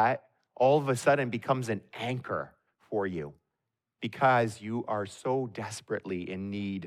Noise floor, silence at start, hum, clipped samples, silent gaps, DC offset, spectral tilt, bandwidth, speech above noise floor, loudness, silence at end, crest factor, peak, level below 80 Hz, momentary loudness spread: -86 dBFS; 0 s; none; under 0.1%; none; under 0.1%; -6 dB/octave; 14.5 kHz; 56 dB; -30 LUFS; 0 s; 18 dB; -12 dBFS; -72 dBFS; 12 LU